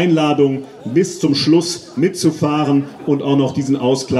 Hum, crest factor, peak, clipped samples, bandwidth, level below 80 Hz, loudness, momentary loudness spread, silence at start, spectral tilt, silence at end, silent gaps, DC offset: none; 14 dB; -2 dBFS; under 0.1%; 12.5 kHz; -56 dBFS; -16 LUFS; 6 LU; 0 s; -5.5 dB/octave; 0 s; none; under 0.1%